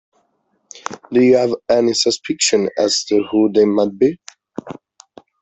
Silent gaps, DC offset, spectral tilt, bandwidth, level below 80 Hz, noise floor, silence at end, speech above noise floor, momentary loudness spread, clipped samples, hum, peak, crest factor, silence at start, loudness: none; under 0.1%; -3.5 dB/octave; 8.4 kHz; -58 dBFS; -65 dBFS; 0.7 s; 50 dB; 20 LU; under 0.1%; none; -2 dBFS; 16 dB; 0.75 s; -16 LUFS